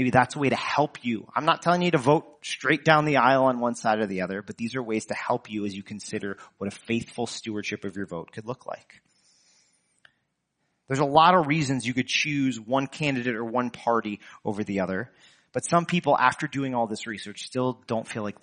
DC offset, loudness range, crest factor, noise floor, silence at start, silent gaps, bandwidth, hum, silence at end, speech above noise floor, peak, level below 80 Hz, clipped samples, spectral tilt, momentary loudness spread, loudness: under 0.1%; 11 LU; 24 dB; -76 dBFS; 0 s; none; 10 kHz; none; 0.1 s; 51 dB; -2 dBFS; -66 dBFS; under 0.1%; -5 dB/octave; 15 LU; -25 LUFS